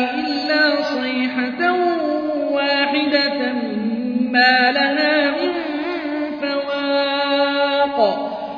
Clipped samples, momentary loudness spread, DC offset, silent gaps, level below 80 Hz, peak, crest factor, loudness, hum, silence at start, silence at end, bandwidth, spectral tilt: under 0.1%; 8 LU; under 0.1%; none; -62 dBFS; -4 dBFS; 16 dB; -18 LUFS; none; 0 s; 0 s; 5.4 kHz; -5 dB/octave